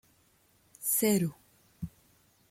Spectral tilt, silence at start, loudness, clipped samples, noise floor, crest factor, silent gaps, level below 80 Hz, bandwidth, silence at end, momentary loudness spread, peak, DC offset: -4.5 dB/octave; 0.8 s; -29 LUFS; under 0.1%; -67 dBFS; 20 dB; none; -64 dBFS; 16.5 kHz; 0.65 s; 19 LU; -16 dBFS; under 0.1%